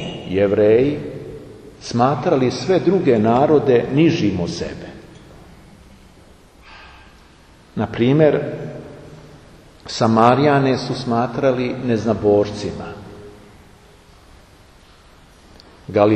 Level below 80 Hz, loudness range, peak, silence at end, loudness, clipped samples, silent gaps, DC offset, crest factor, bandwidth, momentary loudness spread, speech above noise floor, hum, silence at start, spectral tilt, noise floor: -48 dBFS; 11 LU; 0 dBFS; 0 s; -17 LUFS; under 0.1%; none; under 0.1%; 20 dB; 9.6 kHz; 22 LU; 31 dB; none; 0 s; -7 dB/octave; -47 dBFS